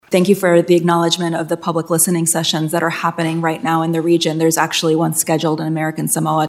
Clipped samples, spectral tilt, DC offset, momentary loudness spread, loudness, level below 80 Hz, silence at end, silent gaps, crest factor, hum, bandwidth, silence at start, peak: under 0.1%; -4.5 dB/octave; under 0.1%; 6 LU; -16 LUFS; -68 dBFS; 0 s; none; 16 dB; none; 16 kHz; 0.1 s; 0 dBFS